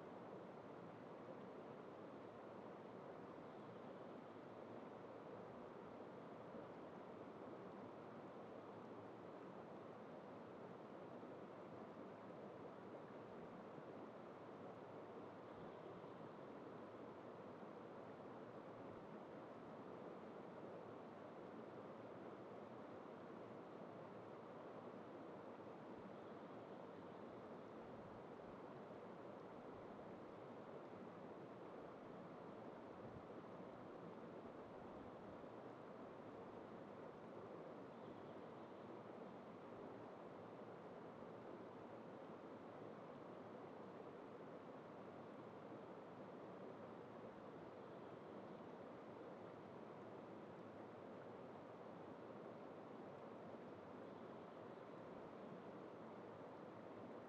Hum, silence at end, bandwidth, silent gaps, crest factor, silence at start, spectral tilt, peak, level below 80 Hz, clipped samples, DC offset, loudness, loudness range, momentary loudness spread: none; 0 s; 7.6 kHz; none; 14 dB; 0 s; -6 dB/octave; -42 dBFS; -88 dBFS; under 0.1%; under 0.1%; -57 LUFS; 0 LU; 1 LU